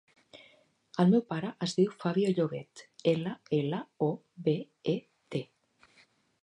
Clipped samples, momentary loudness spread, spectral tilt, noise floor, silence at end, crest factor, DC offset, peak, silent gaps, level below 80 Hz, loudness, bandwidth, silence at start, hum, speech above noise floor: under 0.1%; 12 LU; -7 dB/octave; -66 dBFS; 1 s; 20 dB; under 0.1%; -12 dBFS; none; -78 dBFS; -31 LUFS; 10.5 kHz; 0.35 s; none; 36 dB